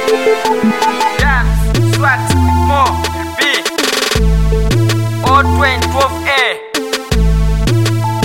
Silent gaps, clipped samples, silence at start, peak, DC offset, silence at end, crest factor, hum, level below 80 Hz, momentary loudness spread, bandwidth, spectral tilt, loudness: none; under 0.1%; 0 s; 0 dBFS; 2%; 0 s; 12 dB; none; -18 dBFS; 3 LU; 17 kHz; -5 dB/octave; -12 LUFS